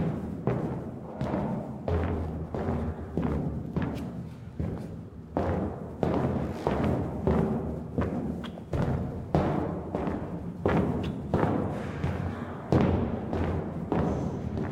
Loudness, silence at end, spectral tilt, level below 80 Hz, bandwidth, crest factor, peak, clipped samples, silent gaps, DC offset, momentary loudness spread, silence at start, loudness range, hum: -31 LUFS; 0 s; -9 dB/octave; -44 dBFS; 11 kHz; 20 dB; -10 dBFS; under 0.1%; none; under 0.1%; 8 LU; 0 s; 3 LU; none